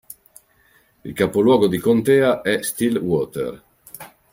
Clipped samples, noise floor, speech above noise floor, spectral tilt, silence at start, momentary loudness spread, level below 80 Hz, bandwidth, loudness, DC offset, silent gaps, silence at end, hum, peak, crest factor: under 0.1%; -58 dBFS; 40 dB; -5.5 dB/octave; 1.05 s; 23 LU; -56 dBFS; 16.5 kHz; -19 LUFS; under 0.1%; none; 0.25 s; none; -2 dBFS; 18 dB